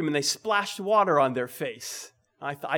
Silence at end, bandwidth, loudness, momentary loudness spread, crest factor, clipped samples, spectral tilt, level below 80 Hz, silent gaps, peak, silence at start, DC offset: 0 s; over 20 kHz; -26 LUFS; 15 LU; 18 dB; under 0.1%; -3.5 dB/octave; -80 dBFS; none; -10 dBFS; 0 s; under 0.1%